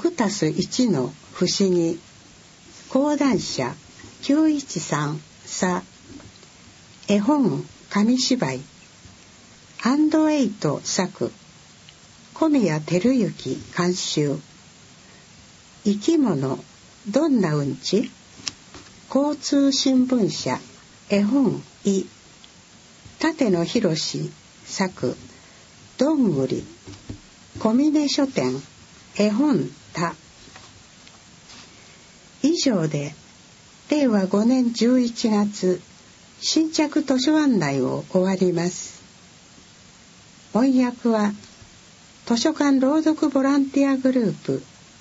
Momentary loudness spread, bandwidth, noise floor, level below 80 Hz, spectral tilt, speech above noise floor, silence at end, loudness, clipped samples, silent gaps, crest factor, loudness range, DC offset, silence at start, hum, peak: 14 LU; 8 kHz; -49 dBFS; -60 dBFS; -5 dB/octave; 28 dB; 0.35 s; -22 LUFS; under 0.1%; none; 18 dB; 4 LU; under 0.1%; 0 s; none; -6 dBFS